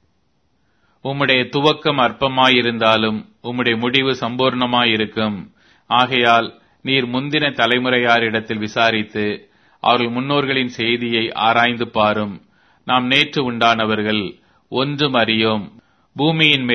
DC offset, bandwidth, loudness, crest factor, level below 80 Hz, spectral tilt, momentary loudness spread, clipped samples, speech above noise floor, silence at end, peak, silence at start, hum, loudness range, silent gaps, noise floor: under 0.1%; 8 kHz; -17 LUFS; 18 dB; -56 dBFS; -5.5 dB/octave; 10 LU; under 0.1%; 48 dB; 0 s; 0 dBFS; 1.05 s; none; 2 LU; none; -65 dBFS